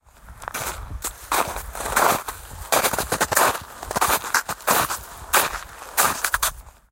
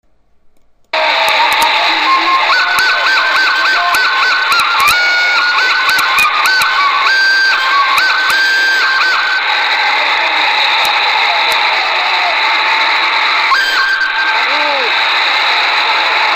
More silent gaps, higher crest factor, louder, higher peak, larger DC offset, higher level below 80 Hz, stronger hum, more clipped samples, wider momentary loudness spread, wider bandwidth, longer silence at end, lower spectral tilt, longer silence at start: neither; first, 24 dB vs 12 dB; second, -22 LUFS vs -9 LUFS; about the same, 0 dBFS vs 0 dBFS; second, under 0.1% vs 0.2%; first, -42 dBFS vs -52 dBFS; neither; neither; first, 12 LU vs 2 LU; about the same, 17 kHz vs 15.5 kHz; first, 0.2 s vs 0 s; first, -1.5 dB/octave vs 1 dB/octave; second, 0.25 s vs 0.95 s